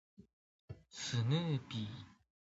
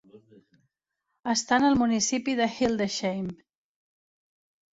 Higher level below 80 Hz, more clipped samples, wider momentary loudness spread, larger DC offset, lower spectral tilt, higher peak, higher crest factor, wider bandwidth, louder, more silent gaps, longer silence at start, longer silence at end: second, -70 dBFS vs -60 dBFS; neither; first, 21 LU vs 11 LU; neither; first, -5.5 dB/octave vs -3.5 dB/octave; second, -22 dBFS vs -8 dBFS; about the same, 18 dB vs 20 dB; about the same, 7.6 kHz vs 8 kHz; second, -39 LUFS vs -25 LUFS; first, 0.33-0.68 s vs none; about the same, 0.2 s vs 0.15 s; second, 0.4 s vs 1.45 s